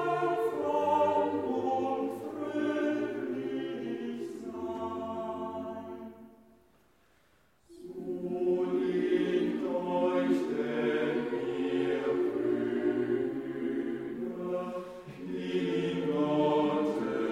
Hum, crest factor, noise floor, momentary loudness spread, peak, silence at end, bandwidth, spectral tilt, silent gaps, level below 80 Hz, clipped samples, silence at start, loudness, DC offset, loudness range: none; 16 dB; -67 dBFS; 11 LU; -16 dBFS; 0 s; 11 kHz; -7 dB/octave; none; -70 dBFS; under 0.1%; 0 s; -32 LUFS; under 0.1%; 9 LU